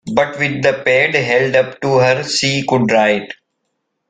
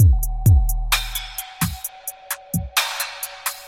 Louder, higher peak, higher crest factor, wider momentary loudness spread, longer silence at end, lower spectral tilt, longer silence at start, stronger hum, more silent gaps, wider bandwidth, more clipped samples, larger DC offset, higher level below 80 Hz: first, -14 LUFS vs -22 LUFS; first, 0 dBFS vs -4 dBFS; about the same, 14 dB vs 16 dB; second, 4 LU vs 13 LU; first, 0.75 s vs 0 s; about the same, -4.5 dB/octave vs -3.5 dB/octave; about the same, 0.05 s vs 0 s; neither; neither; second, 9.4 kHz vs 17 kHz; neither; neither; second, -54 dBFS vs -24 dBFS